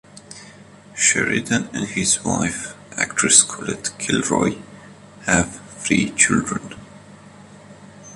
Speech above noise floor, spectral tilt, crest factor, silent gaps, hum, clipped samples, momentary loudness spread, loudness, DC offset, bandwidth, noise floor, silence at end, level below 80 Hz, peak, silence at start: 24 dB; -2.5 dB/octave; 22 dB; none; none; under 0.1%; 23 LU; -19 LUFS; under 0.1%; 13.5 kHz; -44 dBFS; 0 s; -48 dBFS; 0 dBFS; 0.15 s